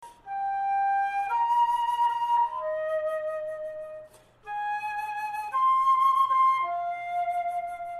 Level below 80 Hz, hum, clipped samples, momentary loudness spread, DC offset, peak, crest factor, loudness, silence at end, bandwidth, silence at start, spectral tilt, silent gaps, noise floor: -66 dBFS; none; under 0.1%; 13 LU; under 0.1%; -14 dBFS; 12 dB; -26 LUFS; 0 s; 13.5 kHz; 0 s; -2 dB/octave; none; -49 dBFS